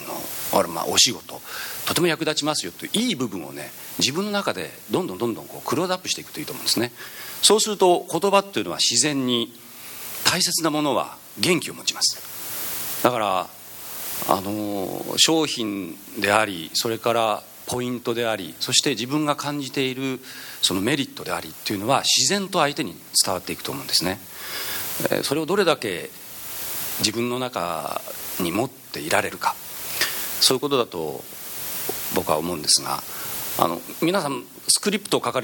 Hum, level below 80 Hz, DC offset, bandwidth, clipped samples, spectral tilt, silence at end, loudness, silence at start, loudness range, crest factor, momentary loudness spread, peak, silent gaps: none; -62 dBFS; under 0.1%; 17.5 kHz; under 0.1%; -2.5 dB/octave; 0 s; -22 LUFS; 0 s; 4 LU; 24 dB; 12 LU; 0 dBFS; none